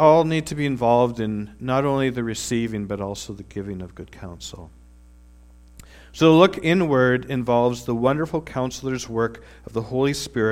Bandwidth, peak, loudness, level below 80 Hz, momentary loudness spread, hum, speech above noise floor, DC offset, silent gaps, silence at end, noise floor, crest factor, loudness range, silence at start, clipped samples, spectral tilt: 16 kHz; 0 dBFS; -21 LUFS; -48 dBFS; 19 LU; 60 Hz at -50 dBFS; 27 dB; under 0.1%; none; 0 s; -48 dBFS; 20 dB; 11 LU; 0 s; under 0.1%; -6 dB/octave